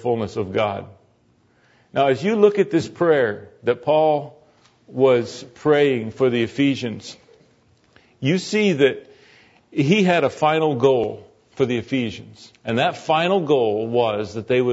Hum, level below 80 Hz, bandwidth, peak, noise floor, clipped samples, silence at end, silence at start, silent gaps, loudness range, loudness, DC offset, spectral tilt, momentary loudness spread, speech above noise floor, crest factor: none; -62 dBFS; 8 kHz; -2 dBFS; -59 dBFS; under 0.1%; 0 s; 0 s; none; 2 LU; -20 LUFS; under 0.1%; -6 dB/octave; 12 LU; 40 dB; 18 dB